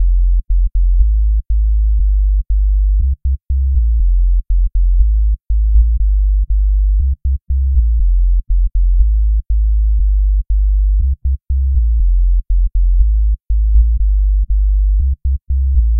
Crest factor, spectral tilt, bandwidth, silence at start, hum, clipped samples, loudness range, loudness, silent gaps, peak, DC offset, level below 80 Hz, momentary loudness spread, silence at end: 10 dB; -16 dB/octave; 0.3 kHz; 0 s; none; under 0.1%; 1 LU; -16 LUFS; none; 0 dBFS; 0.8%; -12 dBFS; 3 LU; 0 s